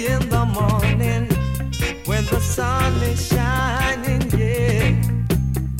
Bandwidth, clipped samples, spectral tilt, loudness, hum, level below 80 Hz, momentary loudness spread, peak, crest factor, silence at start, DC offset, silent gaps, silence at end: 17 kHz; under 0.1%; -5.5 dB/octave; -20 LUFS; none; -26 dBFS; 4 LU; -4 dBFS; 14 dB; 0 s; under 0.1%; none; 0 s